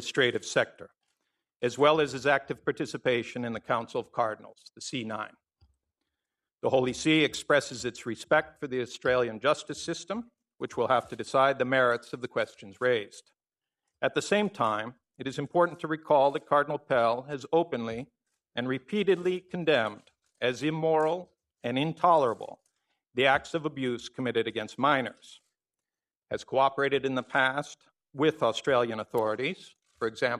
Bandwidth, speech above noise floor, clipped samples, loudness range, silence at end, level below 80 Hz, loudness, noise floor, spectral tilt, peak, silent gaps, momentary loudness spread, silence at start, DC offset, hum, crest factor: 13 kHz; over 62 dB; under 0.1%; 3 LU; 0 s; -68 dBFS; -28 LUFS; under -90 dBFS; -4.5 dB/octave; -8 dBFS; 1.56-1.60 s; 12 LU; 0 s; under 0.1%; none; 22 dB